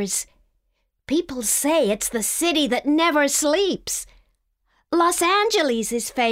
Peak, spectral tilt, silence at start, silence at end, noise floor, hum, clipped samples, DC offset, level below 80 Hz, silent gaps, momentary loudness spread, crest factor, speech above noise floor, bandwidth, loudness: -6 dBFS; -2 dB/octave; 0 s; 0 s; -71 dBFS; none; under 0.1%; under 0.1%; -54 dBFS; none; 8 LU; 16 dB; 51 dB; 16 kHz; -20 LUFS